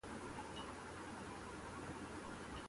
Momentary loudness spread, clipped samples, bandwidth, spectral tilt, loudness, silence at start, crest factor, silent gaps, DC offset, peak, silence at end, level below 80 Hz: 1 LU; under 0.1%; 11.5 kHz; -4.5 dB/octave; -50 LUFS; 0.05 s; 14 dB; none; under 0.1%; -36 dBFS; 0 s; -62 dBFS